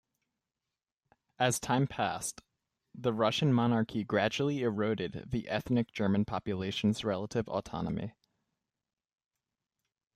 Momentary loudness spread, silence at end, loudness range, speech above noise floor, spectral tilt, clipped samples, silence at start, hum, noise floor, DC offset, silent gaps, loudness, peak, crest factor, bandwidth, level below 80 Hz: 8 LU; 2.05 s; 5 LU; over 59 dB; -5.5 dB/octave; under 0.1%; 1.4 s; none; under -90 dBFS; under 0.1%; none; -32 LUFS; -14 dBFS; 20 dB; 15 kHz; -62 dBFS